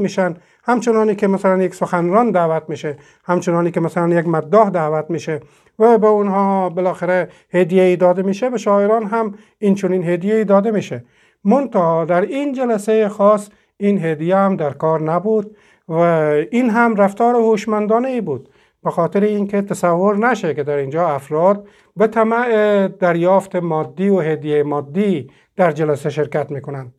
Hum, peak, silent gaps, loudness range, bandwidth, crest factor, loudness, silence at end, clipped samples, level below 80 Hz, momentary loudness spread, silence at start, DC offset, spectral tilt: none; 0 dBFS; none; 2 LU; 12.5 kHz; 16 dB; -16 LUFS; 0.1 s; under 0.1%; -66 dBFS; 9 LU; 0 s; under 0.1%; -7.5 dB/octave